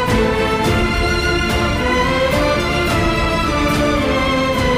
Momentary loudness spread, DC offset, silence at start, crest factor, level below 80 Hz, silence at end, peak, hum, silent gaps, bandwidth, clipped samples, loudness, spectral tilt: 1 LU; under 0.1%; 0 s; 10 dB; -26 dBFS; 0 s; -6 dBFS; none; none; 16 kHz; under 0.1%; -16 LUFS; -5 dB/octave